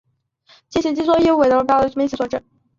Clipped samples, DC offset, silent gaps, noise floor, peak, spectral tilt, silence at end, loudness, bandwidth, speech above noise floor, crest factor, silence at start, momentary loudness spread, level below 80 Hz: under 0.1%; under 0.1%; none; -55 dBFS; -2 dBFS; -5.5 dB/octave; 0.4 s; -17 LUFS; 7.6 kHz; 39 dB; 16 dB; 0.7 s; 11 LU; -48 dBFS